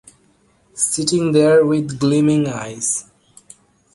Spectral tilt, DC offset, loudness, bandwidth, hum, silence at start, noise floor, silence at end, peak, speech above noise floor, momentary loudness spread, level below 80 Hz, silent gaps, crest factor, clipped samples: -5 dB/octave; under 0.1%; -17 LUFS; 11.5 kHz; none; 0.75 s; -57 dBFS; 0.9 s; -2 dBFS; 41 dB; 10 LU; -56 dBFS; none; 16 dB; under 0.1%